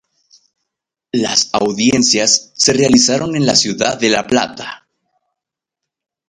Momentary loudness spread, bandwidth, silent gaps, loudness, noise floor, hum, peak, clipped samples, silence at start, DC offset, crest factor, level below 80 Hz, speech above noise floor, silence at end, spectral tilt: 9 LU; 11 kHz; none; -13 LUFS; -83 dBFS; none; 0 dBFS; under 0.1%; 1.15 s; under 0.1%; 16 dB; -50 dBFS; 70 dB; 1.55 s; -2.5 dB/octave